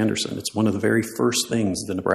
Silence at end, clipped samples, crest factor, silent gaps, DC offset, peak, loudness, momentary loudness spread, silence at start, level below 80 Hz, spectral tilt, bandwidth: 0 s; under 0.1%; 18 dB; none; under 0.1%; -4 dBFS; -23 LUFS; 5 LU; 0 s; -58 dBFS; -4.5 dB/octave; 15 kHz